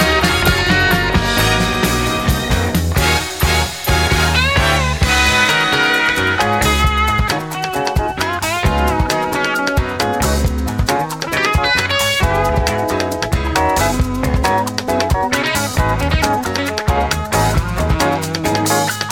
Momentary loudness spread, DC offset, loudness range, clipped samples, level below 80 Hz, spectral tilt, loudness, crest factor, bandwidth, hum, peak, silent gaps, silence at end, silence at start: 5 LU; 0.2%; 3 LU; under 0.1%; -24 dBFS; -4 dB/octave; -15 LUFS; 16 dB; 18 kHz; none; 0 dBFS; none; 0 s; 0 s